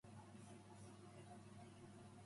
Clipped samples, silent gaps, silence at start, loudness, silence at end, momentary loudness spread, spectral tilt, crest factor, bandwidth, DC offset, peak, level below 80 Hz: under 0.1%; none; 0.05 s; -61 LUFS; 0 s; 1 LU; -5.5 dB/octave; 14 dB; 11.5 kHz; under 0.1%; -46 dBFS; -80 dBFS